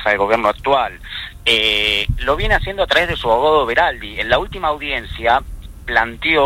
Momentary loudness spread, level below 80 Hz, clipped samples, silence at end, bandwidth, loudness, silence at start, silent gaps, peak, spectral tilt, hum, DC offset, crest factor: 9 LU; -30 dBFS; under 0.1%; 0 s; 16 kHz; -16 LUFS; 0 s; none; 0 dBFS; -4 dB/octave; none; under 0.1%; 16 dB